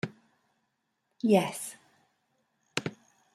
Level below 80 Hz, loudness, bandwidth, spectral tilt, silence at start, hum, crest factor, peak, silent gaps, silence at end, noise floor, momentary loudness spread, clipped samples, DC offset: -76 dBFS; -31 LUFS; 15 kHz; -5 dB/octave; 0.05 s; none; 26 dB; -8 dBFS; none; 0.4 s; -79 dBFS; 16 LU; under 0.1%; under 0.1%